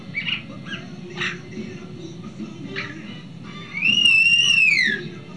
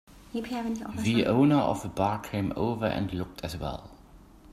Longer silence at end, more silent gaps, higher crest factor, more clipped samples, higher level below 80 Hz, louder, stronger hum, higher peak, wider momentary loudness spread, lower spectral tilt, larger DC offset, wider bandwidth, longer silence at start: about the same, 0 s vs 0 s; neither; about the same, 16 dB vs 18 dB; neither; second, -62 dBFS vs -50 dBFS; first, -16 LUFS vs -29 LUFS; neither; first, -6 dBFS vs -10 dBFS; first, 23 LU vs 14 LU; second, -2 dB/octave vs -6.5 dB/octave; first, 0.4% vs under 0.1%; second, 11 kHz vs 15 kHz; about the same, 0 s vs 0.1 s